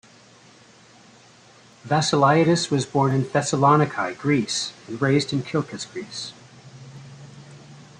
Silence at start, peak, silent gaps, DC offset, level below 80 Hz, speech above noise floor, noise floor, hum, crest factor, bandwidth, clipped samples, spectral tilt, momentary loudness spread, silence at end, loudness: 1.85 s; -4 dBFS; none; under 0.1%; -62 dBFS; 30 dB; -51 dBFS; none; 20 dB; 10.5 kHz; under 0.1%; -5 dB/octave; 25 LU; 0.2 s; -22 LUFS